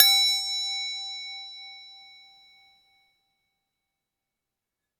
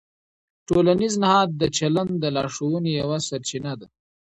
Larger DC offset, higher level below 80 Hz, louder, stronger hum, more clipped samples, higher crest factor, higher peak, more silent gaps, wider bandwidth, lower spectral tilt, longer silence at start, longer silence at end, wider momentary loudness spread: neither; second, -88 dBFS vs -54 dBFS; about the same, -24 LUFS vs -22 LUFS; neither; neither; first, 30 dB vs 18 dB; first, 0 dBFS vs -6 dBFS; neither; first, 19 kHz vs 9 kHz; second, 7 dB/octave vs -5 dB/octave; second, 0 s vs 0.7 s; first, 3 s vs 0.5 s; first, 25 LU vs 10 LU